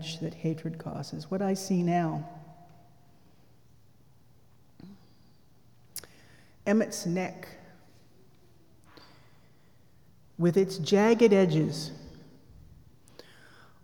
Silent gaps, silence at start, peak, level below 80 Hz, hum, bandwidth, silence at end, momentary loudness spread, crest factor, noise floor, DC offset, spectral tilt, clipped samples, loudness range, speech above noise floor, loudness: none; 0 s; -10 dBFS; -68 dBFS; none; over 20 kHz; 1.65 s; 24 LU; 22 dB; -62 dBFS; 0.1%; -6 dB/octave; under 0.1%; 16 LU; 35 dB; -28 LUFS